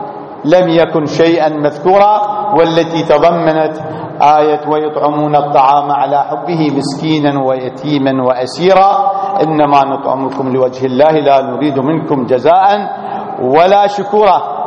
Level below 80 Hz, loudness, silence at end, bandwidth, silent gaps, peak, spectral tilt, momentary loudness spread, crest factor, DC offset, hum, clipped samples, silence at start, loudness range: -50 dBFS; -11 LUFS; 0 s; 10 kHz; none; 0 dBFS; -6.5 dB/octave; 7 LU; 10 dB; under 0.1%; none; 0.2%; 0 s; 2 LU